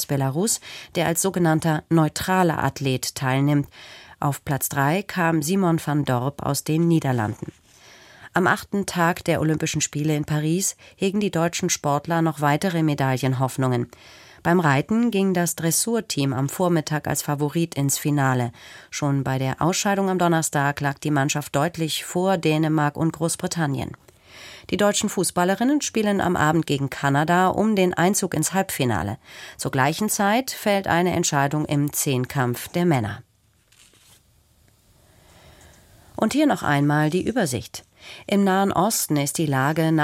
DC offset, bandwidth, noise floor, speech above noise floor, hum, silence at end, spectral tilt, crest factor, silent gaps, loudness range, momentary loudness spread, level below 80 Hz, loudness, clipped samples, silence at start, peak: under 0.1%; 16.5 kHz; -60 dBFS; 39 dB; none; 0 s; -5 dB/octave; 18 dB; none; 3 LU; 7 LU; -54 dBFS; -22 LUFS; under 0.1%; 0 s; -4 dBFS